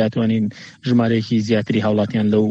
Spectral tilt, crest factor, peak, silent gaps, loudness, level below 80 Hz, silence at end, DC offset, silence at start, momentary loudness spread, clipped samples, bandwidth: -7.5 dB/octave; 14 dB; -4 dBFS; none; -19 LUFS; -56 dBFS; 0 s; under 0.1%; 0 s; 4 LU; under 0.1%; 7.6 kHz